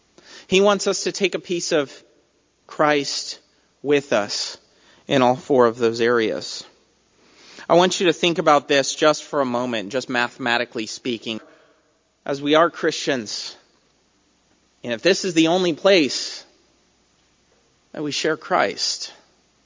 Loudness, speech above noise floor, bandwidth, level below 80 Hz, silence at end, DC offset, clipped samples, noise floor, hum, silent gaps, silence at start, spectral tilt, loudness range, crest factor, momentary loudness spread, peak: -20 LUFS; 43 dB; 7.8 kHz; -68 dBFS; 0.5 s; under 0.1%; under 0.1%; -63 dBFS; none; none; 0.3 s; -3.5 dB/octave; 5 LU; 20 dB; 15 LU; -2 dBFS